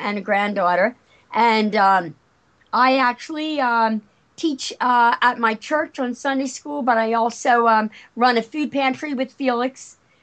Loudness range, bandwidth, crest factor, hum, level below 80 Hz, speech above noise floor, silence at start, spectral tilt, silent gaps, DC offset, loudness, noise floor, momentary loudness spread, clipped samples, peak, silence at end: 1 LU; 9 kHz; 16 dB; none; -72 dBFS; 40 dB; 0 s; -4 dB/octave; none; under 0.1%; -20 LUFS; -59 dBFS; 9 LU; under 0.1%; -4 dBFS; 0.35 s